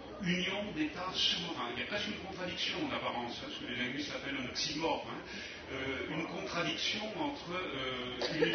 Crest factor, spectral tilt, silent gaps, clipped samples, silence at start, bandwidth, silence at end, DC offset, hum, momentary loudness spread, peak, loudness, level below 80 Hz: 20 dB; -2 dB/octave; none; under 0.1%; 0 s; 6.4 kHz; 0 s; under 0.1%; none; 7 LU; -18 dBFS; -36 LUFS; -62 dBFS